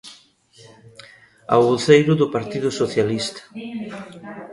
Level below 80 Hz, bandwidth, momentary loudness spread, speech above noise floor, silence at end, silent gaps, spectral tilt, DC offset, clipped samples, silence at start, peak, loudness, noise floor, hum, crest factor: -58 dBFS; 11.5 kHz; 21 LU; 32 dB; 0 s; none; -5.5 dB/octave; under 0.1%; under 0.1%; 0.05 s; 0 dBFS; -19 LUFS; -51 dBFS; none; 20 dB